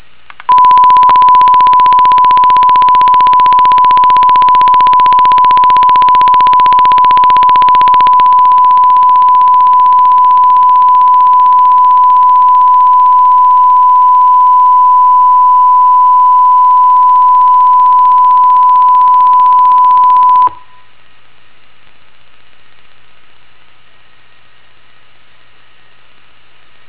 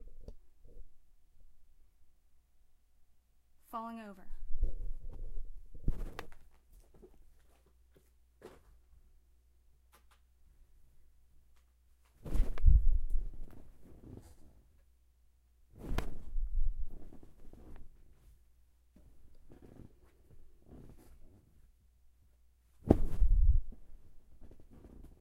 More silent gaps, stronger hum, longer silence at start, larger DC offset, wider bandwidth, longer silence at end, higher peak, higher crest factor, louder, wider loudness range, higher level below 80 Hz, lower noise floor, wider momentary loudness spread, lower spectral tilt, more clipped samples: neither; neither; first, 0.5 s vs 0.05 s; first, 3% vs under 0.1%; about the same, 4 kHz vs 3.8 kHz; first, 6.35 s vs 0.2 s; first, 0 dBFS vs -6 dBFS; second, 6 dB vs 28 dB; first, -5 LUFS vs -38 LUFS; second, 2 LU vs 24 LU; second, -48 dBFS vs -38 dBFS; second, -46 dBFS vs -67 dBFS; second, 1 LU vs 28 LU; second, -6.5 dB/octave vs -8.5 dB/octave; neither